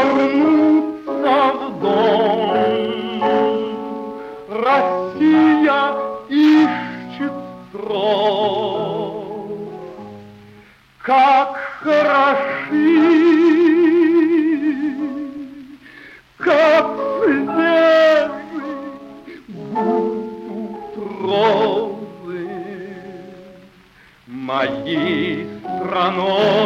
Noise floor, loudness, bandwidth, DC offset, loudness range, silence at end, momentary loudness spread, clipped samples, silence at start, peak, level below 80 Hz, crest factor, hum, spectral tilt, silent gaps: -49 dBFS; -16 LUFS; 7 kHz; under 0.1%; 8 LU; 0 s; 18 LU; under 0.1%; 0 s; -2 dBFS; -60 dBFS; 14 dB; none; -6.5 dB/octave; none